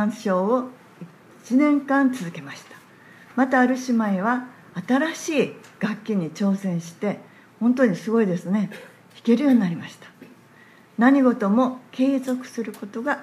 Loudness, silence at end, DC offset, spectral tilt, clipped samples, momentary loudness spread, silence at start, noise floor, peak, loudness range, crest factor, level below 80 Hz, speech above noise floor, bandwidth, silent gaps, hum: -22 LUFS; 0 s; under 0.1%; -6.5 dB/octave; under 0.1%; 15 LU; 0 s; -51 dBFS; -4 dBFS; 3 LU; 18 dB; -78 dBFS; 29 dB; 13 kHz; none; none